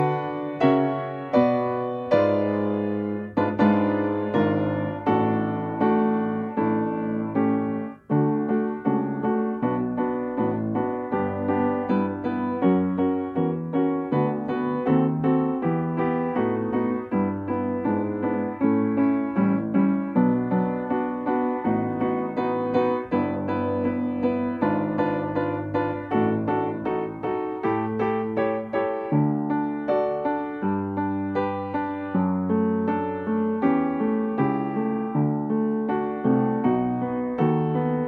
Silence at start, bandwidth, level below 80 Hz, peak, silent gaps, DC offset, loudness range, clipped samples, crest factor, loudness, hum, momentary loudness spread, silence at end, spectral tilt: 0 s; 4.9 kHz; -60 dBFS; -8 dBFS; none; under 0.1%; 2 LU; under 0.1%; 16 dB; -24 LUFS; none; 5 LU; 0 s; -10.5 dB/octave